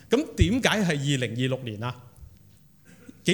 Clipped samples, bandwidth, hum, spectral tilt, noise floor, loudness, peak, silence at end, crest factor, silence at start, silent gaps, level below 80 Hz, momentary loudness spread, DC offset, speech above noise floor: under 0.1%; 18 kHz; none; -5 dB/octave; -55 dBFS; -26 LUFS; -6 dBFS; 0 s; 22 dB; 0.1 s; none; -40 dBFS; 12 LU; under 0.1%; 31 dB